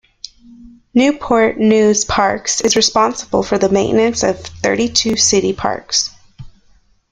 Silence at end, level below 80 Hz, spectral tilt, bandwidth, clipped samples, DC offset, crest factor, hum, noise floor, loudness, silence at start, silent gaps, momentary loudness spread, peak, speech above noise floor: 0.65 s; -44 dBFS; -3 dB/octave; 11 kHz; under 0.1%; under 0.1%; 16 dB; none; -52 dBFS; -14 LUFS; 0.6 s; none; 7 LU; 0 dBFS; 38 dB